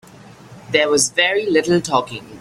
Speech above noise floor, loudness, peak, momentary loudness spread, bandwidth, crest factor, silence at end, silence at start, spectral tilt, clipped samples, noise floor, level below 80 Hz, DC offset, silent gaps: 24 dB; -16 LUFS; -2 dBFS; 6 LU; 15 kHz; 16 dB; 0 s; 0.5 s; -3 dB/octave; under 0.1%; -42 dBFS; -56 dBFS; under 0.1%; none